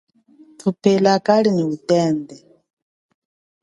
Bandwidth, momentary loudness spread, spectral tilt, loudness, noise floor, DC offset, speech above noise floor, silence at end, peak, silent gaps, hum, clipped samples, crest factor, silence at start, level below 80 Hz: 11.5 kHz; 10 LU; -6.5 dB/octave; -18 LUFS; -50 dBFS; under 0.1%; 33 dB; 1.25 s; 0 dBFS; none; none; under 0.1%; 20 dB; 0.65 s; -66 dBFS